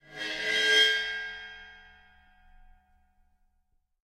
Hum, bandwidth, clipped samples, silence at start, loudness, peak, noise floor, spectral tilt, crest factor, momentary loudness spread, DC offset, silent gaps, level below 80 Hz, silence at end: none; 16 kHz; under 0.1%; 0.1 s; -25 LUFS; -12 dBFS; -72 dBFS; 0.5 dB/octave; 22 dB; 23 LU; under 0.1%; none; -62 dBFS; 2.25 s